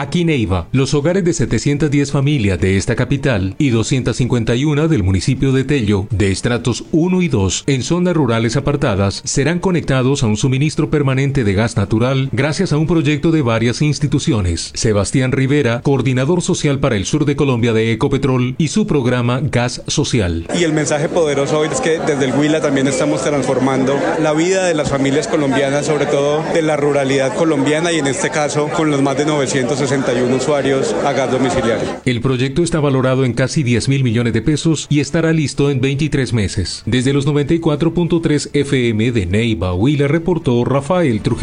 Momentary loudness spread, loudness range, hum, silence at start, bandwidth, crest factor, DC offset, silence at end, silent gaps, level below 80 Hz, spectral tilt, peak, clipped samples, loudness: 2 LU; 1 LU; none; 0 s; 11 kHz; 12 dB; under 0.1%; 0 s; none; -36 dBFS; -5.5 dB/octave; -2 dBFS; under 0.1%; -15 LUFS